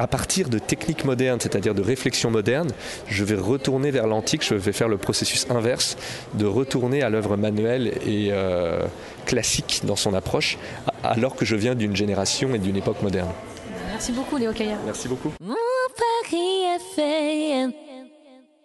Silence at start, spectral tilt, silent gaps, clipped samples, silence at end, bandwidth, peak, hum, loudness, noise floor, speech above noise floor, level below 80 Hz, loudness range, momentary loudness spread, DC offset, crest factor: 0 s; -4.5 dB/octave; none; under 0.1%; 0.3 s; 12.5 kHz; -6 dBFS; none; -23 LUFS; -51 dBFS; 28 dB; -46 dBFS; 3 LU; 7 LU; under 0.1%; 18 dB